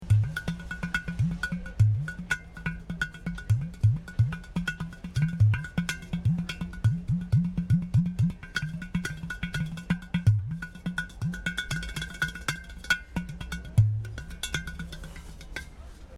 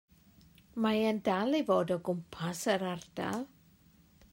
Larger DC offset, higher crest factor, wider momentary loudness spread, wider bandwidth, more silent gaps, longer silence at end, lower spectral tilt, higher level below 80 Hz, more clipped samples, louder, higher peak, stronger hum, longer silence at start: neither; about the same, 18 dB vs 18 dB; first, 12 LU vs 9 LU; second, 13 kHz vs 16 kHz; neither; second, 0 s vs 0.85 s; about the same, -5.5 dB/octave vs -5.5 dB/octave; first, -42 dBFS vs -68 dBFS; neither; first, -30 LUFS vs -33 LUFS; first, -10 dBFS vs -16 dBFS; neither; second, 0 s vs 0.75 s